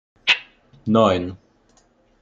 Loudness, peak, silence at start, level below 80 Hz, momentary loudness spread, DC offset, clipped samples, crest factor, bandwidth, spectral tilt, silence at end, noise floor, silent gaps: -19 LUFS; -2 dBFS; 0.25 s; -60 dBFS; 15 LU; under 0.1%; under 0.1%; 22 dB; 7.8 kHz; -5 dB/octave; 0.85 s; -59 dBFS; none